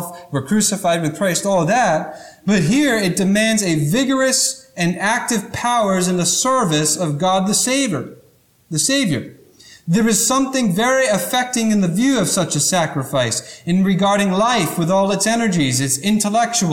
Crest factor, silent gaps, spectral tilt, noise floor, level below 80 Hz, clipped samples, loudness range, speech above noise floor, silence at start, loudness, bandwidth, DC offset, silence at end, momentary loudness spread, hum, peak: 12 dB; none; -4 dB/octave; -54 dBFS; -52 dBFS; under 0.1%; 2 LU; 37 dB; 0 s; -17 LUFS; 18.5 kHz; under 0.1%; 0 s; 6 LU; none; -4 dBFS